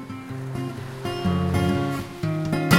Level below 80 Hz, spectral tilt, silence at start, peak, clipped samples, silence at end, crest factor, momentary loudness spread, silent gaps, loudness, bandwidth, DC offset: -44 dBFS; -6 dB/octave; 0 s; -2 dBFS; under 0.1%; 0 s; 22 dB; 10 LU; none; -26 LUFS; 17 kHz; under 0.1%